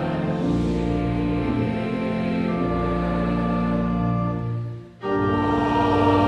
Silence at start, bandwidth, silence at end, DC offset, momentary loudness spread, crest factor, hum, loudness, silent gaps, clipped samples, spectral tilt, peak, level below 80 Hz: 0 s; 8.8 kHz; 0 s; under 0.1%; 6 LU; 14 dB; none; -23 LUFS; none; under 0.1%; -8.5 dB/octave; -8 dBFS; -36 dBFS